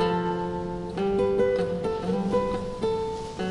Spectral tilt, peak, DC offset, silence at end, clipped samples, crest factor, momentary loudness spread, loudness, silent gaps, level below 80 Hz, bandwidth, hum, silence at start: -7 dB/octave; -12 dBFS; under 0.1%; 0 s; under 0.1%; 14 dB; 8 LU; -27 LUFS; none; -46 dBFS; 11.5 kHz; none; 0 s